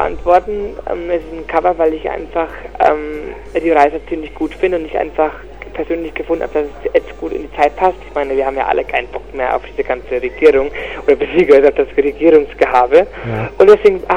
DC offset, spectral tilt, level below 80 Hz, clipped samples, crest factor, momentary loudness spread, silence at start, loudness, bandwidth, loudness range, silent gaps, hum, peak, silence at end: 1%; -7 dB/octave; -36 dBFS; 0.1%; 14 dB; 13 LU; 0 s; -15 LUFS; 8.4 kHz; 6 LU; none; none; 0 dBFS; 0 s